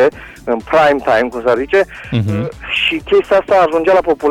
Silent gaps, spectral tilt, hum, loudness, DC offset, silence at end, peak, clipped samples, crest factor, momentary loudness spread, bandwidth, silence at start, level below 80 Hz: none; -6 dB/octave; none; -14 LUFS; under 0.1%; 0 s; -4 dBFS; under 0.1%; 10 dB; 8 LU; 14.5 kHz; 0 s; -40 dBFS